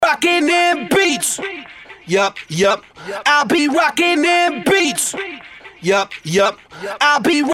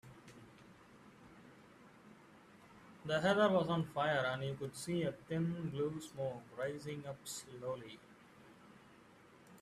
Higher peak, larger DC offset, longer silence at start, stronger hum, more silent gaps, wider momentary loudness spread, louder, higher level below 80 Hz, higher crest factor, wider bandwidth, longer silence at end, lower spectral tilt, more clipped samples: first, -2 dBFS vs -20 dBFS; neither; about the same, 0 s vs 0.05 s; neither; neither; second, 15 LU vs 27 LU; first, -15 LUFS vs -38 LUFS; first, -56 dBFS vs -74 dBFS; second, 14 dB vs 22 dB; first, 16.5 kHz vs 14 kHz; about the same, 0 s vs 0 s; second, -3 dB/octave vs -5.5 dB/octave; neither